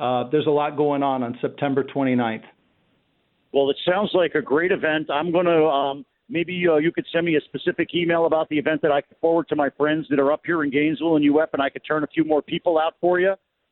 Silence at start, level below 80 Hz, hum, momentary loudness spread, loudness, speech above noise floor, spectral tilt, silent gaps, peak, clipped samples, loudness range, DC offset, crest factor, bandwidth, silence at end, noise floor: 0 s; -66 dBFS; none; 6 LU; -21 LUFS; 46 dB; -10.5 dB/octave; none; -6 dBFS; under 0.1%; 3 LU; under 0.1%; 14 dB; 4.2 kHz; 0.35 s; -67 dBFS